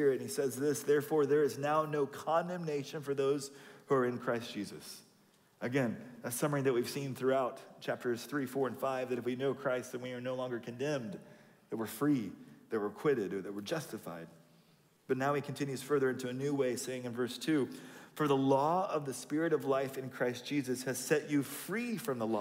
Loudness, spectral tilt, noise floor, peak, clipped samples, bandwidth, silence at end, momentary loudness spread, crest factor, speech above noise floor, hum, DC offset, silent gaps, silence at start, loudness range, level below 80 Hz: -35 LUFS; -5.5 dB/octave; -67 dBFS; -18 dBFS; under 0.1%; 16 kHz; 0 s; 12 LU; 18 dB; 33 dB; none; under 0.1%; none; 0 s; 4 LU; -82 dBFS